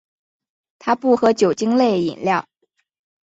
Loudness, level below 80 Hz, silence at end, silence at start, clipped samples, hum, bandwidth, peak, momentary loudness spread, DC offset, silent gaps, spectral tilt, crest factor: -18 LUFS; -64 dBFS; 0.8 s; 0.85 s; under 0.1%; none; 8 kHz; -4 dBFS; 7 LU; under 0.1%; none; -5.5 dB/octave; 16 dB